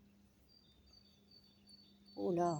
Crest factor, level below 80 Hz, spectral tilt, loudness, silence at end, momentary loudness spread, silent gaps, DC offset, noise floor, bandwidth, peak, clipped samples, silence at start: 20 dB; -76 dBFS; -7 dB/octave; -41 LUFS; 0 s; 26 LU; none; under 0.1%; -68 dBFS; 20 kHz; -24 dBFS; under 0.1%; 1.7 s